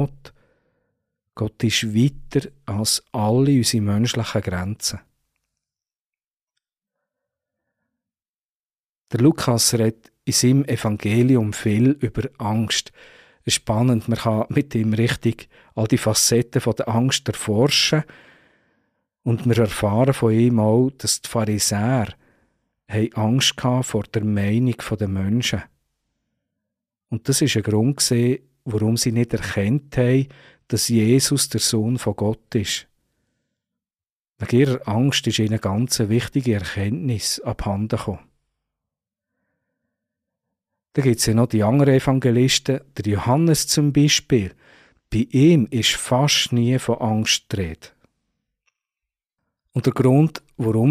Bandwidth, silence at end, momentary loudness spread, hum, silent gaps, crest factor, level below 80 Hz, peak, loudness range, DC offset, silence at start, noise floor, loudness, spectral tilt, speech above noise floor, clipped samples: 15.5 kHz; 0 s; 9 LU; none; 5.99-6.13 s, 6.27-6.47 s, 8.29-8.70 s, 8.79-9.01 s, 34.10-34.34 s; 16 dB; -48 dBFS; -6 dBFS; 6 LU; under 0.1%; 0 s; under -90 dBFS; -20 LUFS; -5 dB/octave; over 71 dB; under 0.1%